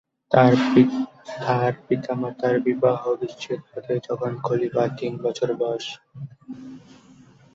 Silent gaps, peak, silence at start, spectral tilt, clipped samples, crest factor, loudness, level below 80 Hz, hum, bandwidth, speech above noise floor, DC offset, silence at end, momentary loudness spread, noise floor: none; -2 dBFS; 0.3 s; -7 dB/octave; under 0.1%; 20 dB; -23 LUFS; -62 dBFS; none; 7.6 kHz; 28 dB; under 0.1%; 0.75 s; 21 LU; -51 dBFS